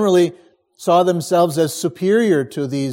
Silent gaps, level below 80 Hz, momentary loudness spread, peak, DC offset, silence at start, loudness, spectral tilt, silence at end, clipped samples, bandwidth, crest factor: none; -66 dBFS; 7 LU; -4 dBFS; under 0.1%; 0 s; -17 LUFS; -5.5 dB/octave; 0 s; under 0.1%; 17 kHz; 14 dB